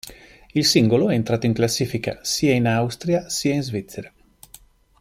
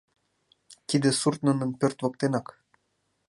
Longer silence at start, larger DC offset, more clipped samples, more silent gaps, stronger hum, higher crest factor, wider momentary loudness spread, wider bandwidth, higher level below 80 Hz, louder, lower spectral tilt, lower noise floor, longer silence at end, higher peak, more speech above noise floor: second, 0.05 s vs 0.7 s; neither; neither; neither; neither; about the same, 18 dB vs 20 dB; first, 12 LU vs 5 LU; first, 16 kHz vs 11.5 kHz; first, -52 dBFS vs -70 dBFS; first, -21 LUFS vs -26 LUFS; about the same, -5 dB/octave vs -5 dB/octave; second, -50 dBFS vs -75 dBFS; about the same, 0.9 s vs 0.85 s; first, -4 dBFS vs -10 dBFS; second, 30 dB vs 49 dB